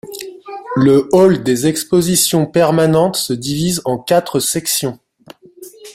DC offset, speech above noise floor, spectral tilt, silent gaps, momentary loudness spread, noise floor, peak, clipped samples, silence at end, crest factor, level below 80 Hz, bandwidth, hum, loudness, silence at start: under 0.1%; 29 dB; -4.5 dB/octave; none; 11 LU; -42 dBFS; 0 dBFS; under 0.1%; 0.05 s; 14 dB; -50 dBFS; 16 kHz; none; -14 LUFS; 0.05 s